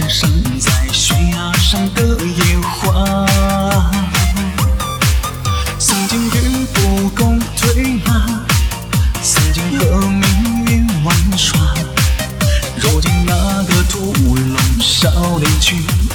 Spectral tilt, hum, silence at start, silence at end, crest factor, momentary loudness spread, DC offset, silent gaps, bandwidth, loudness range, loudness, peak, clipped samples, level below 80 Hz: -4 dB/octave; none; 0 s; 0 s; 14 dB; 4 LU; under 0.1%; none; over 20 kHz; 1 LU; -14 LUFS; 0 dBFS; under 0.1%; -18 dBFS